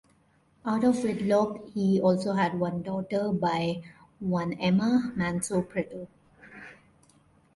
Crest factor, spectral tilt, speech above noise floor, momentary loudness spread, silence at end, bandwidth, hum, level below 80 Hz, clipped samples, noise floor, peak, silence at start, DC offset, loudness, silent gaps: 16 dB; -6.5 dB/octave; 38 dB; 14 LU; 0.85 s; 11.5 kHz; none; -62 dBFS; under 0.1%; -65 dBFS; -12 dBFS; 0.65 s; under 0.1%; -28 LUFS; none